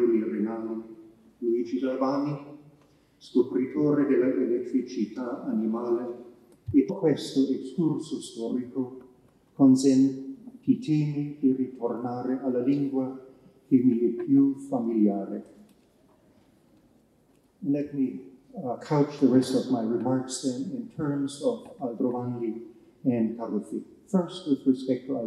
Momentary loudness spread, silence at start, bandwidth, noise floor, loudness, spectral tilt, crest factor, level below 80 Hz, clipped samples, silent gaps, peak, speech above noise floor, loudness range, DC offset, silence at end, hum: 13 LU; 0 s; 11.5 kHz; -63 dBFS; -27 LUFS; -7 dB/octave; 18 dB; -72 dBFS; under 0.1%; none; -8 dBFS; 37 dB; 5 LU; under 0.1%; 0 s; none